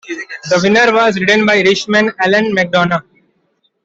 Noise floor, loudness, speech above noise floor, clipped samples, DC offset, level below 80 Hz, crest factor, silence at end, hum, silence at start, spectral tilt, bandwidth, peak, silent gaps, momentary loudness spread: -61 dBFS; -11 LUFS; 50 dB; under 0.1%; under 0.1%; -54 dBFS; 12 dB; 0.85 s; none; 0.05 s; -4.5 dB/octave; 8 kHz; -2 dBFS; none; 7 LU